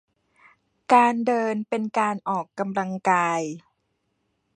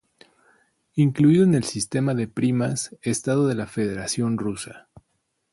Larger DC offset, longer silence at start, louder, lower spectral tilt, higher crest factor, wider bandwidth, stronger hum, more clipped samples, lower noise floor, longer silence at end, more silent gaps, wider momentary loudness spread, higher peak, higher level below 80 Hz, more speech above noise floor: neither; about the same, 0.9 s vs 0.95 s; about the same, -23 LUFS vs -23 LUFS; about the same, -5.5 dB/octave vs -6 dB/octave; first, 22 dB vs 16 dB; about the same, 10.5 kHz vs 11.5 kHz; neither; neither; about the same, -74 dBFS vs -73 dBFS; first, 0.95 s vs 0.75 s; neither; about the same, 11 LU vs 10 LU; first, -4 dBFS vs -8 dBFS; second, -76 dBFS vs -58 dBFS; about the same, 51 dB vs 52 dB